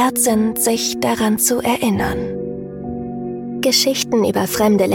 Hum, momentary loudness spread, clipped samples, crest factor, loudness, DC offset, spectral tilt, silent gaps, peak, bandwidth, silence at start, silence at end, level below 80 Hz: none; 12 LU; under 0.1%; 16 dB; -17 LUFS; under 0.1%; -3.5 dB/octave; none; -2 dBFS; 17 kHz; 0 s; 0 s; -42 dBFS